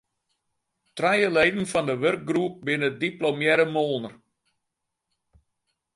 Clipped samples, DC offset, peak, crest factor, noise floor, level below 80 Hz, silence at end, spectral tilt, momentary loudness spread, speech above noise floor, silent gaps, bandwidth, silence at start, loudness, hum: under 0.1%; under 0.1%; -4 dBFS; 22 dB; -82 dBFS; -64 dBFS; 1.8 s; -5 dB/octave; 7 LU; 58 dB; none; 11.5 kHz; 0.95 s; -24 LUFS; none